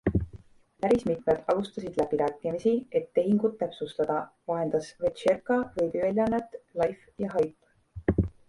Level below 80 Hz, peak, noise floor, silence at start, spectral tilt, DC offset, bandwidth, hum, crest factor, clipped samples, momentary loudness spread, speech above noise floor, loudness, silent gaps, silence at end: -46 dBFS; -12 dBFS; -51 dBFS; 0.05 s; -7.5 dB/octave; under 0.1%; 11.5 kHz; none; 16 dB; under 0.1%; 7 LU; 23 dB; -29 LUFS; none; 0.2 s